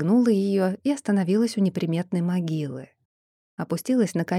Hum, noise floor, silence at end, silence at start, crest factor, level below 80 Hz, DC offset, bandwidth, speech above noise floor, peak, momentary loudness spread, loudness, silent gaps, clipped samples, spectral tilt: none; under -90 dBFS; 0 s; 0 s; 14 dB; -80 dBFS; under 0.1%; 14 kHz; over 67 dB; -10 dBFS; 11 LU; -24 LUFS; 3.05-3.57 s; under 0.1%; -7 dB/octave